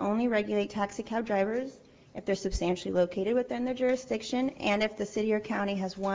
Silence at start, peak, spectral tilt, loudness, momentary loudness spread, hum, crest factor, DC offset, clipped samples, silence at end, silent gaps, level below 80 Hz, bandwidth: 0 s; -14 dBFS; -5.5 dB/octave; -30 LUFS; 6 LU; none; 16 dB; under 0.1%; under 0.1%; 0 s; none; -50 dBFS; 8 kHz